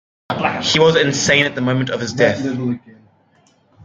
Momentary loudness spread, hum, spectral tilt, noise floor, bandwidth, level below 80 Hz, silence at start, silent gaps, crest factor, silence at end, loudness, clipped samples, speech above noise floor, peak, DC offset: 11 LU; none; -4 dB/octave; -56 dBFS; 9.4 kHz; -54 dBFS; 0.3 s; none; 18 dB; 0.95 s; -16 LUFS; under 0.1%; 40 dB; 0 dBFS; under 0.1%